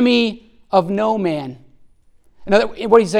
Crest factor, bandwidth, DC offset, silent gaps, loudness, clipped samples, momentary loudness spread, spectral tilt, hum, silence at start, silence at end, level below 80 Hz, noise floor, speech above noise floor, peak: 18 dB; 11 kHz; under 0.1%; none; -18 LUFS; under 0.1%; 18 LU; -5.5 dB/octave; none; 0 s; 0 s; -50 dBFS; -52 dBFS; 36 dB; 0 dBFS